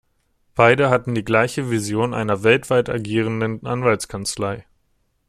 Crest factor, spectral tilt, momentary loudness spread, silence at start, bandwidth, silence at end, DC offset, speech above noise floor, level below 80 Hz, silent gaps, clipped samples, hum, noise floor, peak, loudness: 20 dB; -5.5 dB/octave; 10 LU; 0.55 s; 15 kHz; 0.65 s; under 0.1%; 47 dB; -52 dBFS; none; under 0.1%; none; -66 dBFS; 0 dBFS; -19 LUFS